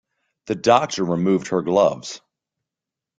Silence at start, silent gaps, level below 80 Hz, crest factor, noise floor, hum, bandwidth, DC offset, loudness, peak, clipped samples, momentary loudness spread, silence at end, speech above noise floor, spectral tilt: 0.45 s; none; -62 dBFS; 20 dB; -87 dBFS; none; 9.2 kHz; under 0.1%; -20 LUFS; -2 dBFS; under 0.1%; 15 LU; 1 s; 68 dB; -5.5 dB/octave